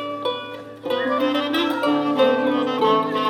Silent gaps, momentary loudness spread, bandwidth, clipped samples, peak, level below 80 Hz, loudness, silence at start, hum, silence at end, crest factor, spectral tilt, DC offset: none; 9 LU; 17 kHz; under 0.1%; -6 dBFS; -72 dBFS; -21 LUFS; 0 s; none; 0 s; 16 dB; -5.5 dB/octave; under 0.1%